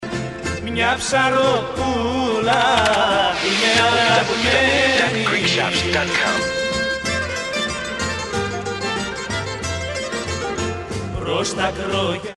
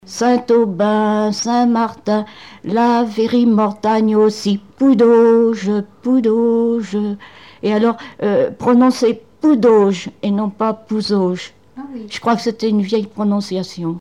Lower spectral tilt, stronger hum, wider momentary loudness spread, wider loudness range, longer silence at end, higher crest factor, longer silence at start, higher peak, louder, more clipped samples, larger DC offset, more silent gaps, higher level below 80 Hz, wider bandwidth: second, -3.5 dB/octave vs -6 dB/octave; neither; about the same, 10 LU vs 10 LU; first, 8 LU vs 5 LU; about the same, 0.05 s vs 0 s; first, 18 dB vs 12 dB; about the same, 0 s vs 0.1 s; about the same, -2 dBFS vs -4 dBFS; second, -19 LUFS vs -16 LUFS; neither; second, 0.1% vs 0.3%; neither; first, -40 dBFS vs -62 dBFS; about the same, 11.5 kHz vs 11 kHz